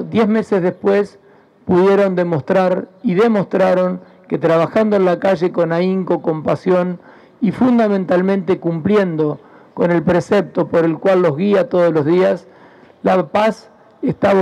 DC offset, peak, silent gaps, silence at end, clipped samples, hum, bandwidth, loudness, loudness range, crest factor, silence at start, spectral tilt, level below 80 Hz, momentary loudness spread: under 0.1%; -4 dBFS; none; 0 s; under 0.1%; none; 9.8 kHz; -16 LUFS; 1 LU; 12 dB; 0 s; -8 dB/octave; -56 dBFS; 7 LU